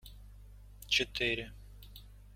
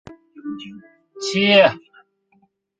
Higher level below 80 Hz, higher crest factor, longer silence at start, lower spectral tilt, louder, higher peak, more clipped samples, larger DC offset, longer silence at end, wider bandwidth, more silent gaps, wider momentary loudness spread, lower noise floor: first, -52 dBFS vs -62 dBFS; about the same, 24 dB vs 20 dB; about the same, 0.05 s vs 0.1 s; second, -2.5 dB/octave vs -4 dB/octave; second, -32 LUFS vs -16 LUFS; second, -16 dBFS vs -2 dBFS; neither; neither; second, 0 s vs 1 s; first, 16.5 kHz vs 9.2 kHz; neither; about the same, 24 LU vs 24 LU; second, -53 dBFS vs -62 dBFS